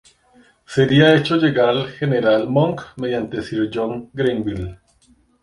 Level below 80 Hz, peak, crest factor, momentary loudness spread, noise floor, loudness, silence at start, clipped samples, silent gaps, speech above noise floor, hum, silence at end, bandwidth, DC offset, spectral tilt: -48 dBFS; -2 dBFS; 18 dB; 12 LU; -56 dBFS; -18 LUFS; 0.7 s; under 0.1%; none; 39 dB; none; 0.7 s; 11 kHz; under 0.1%; -7 dB/octave